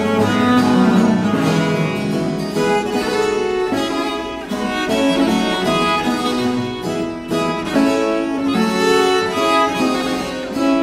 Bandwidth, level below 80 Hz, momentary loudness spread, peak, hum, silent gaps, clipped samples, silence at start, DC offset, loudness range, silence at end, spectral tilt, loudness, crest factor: 16 kHz; -46 dBFS; 8 LU; -4 dBFS; none; none; under 0.1%; 0 s; under 0.1%; 2 LU; 0 s; -5 dB/octave; -17 LUFS; 14 dB